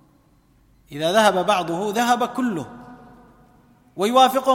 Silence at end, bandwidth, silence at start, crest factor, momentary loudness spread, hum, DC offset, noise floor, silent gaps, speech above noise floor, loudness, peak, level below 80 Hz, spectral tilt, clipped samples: 0 s; 16.5 kHz; 0.9 s; 18 dB; 17 LU; none; under 0.1%; -57 dBFS; none; 38 dB; -20 LUFS; -4 dBFS; -60 dBFS; -4 dB/octave; under 0.1%